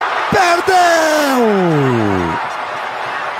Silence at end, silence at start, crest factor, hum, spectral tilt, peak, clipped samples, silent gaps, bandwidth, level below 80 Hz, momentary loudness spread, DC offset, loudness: 0 s; 0 s; 14 dB; none; -4.5 dB/octave; 0 dBFS; under 0.1%; none; 16 kHz; -52 dBFS; 10 LU; under 0.1%; -14 LUFS